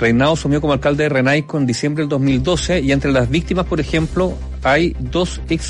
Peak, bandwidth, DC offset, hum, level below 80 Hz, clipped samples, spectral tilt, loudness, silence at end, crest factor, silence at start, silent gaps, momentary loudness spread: -4 dBFS; 11 kHz; under 0.1%; none; -30 dBFS; under 0.1%; -6 dB/octave; -17 LUFS; 0 s; 12 dB; 0 s; none; 5 LU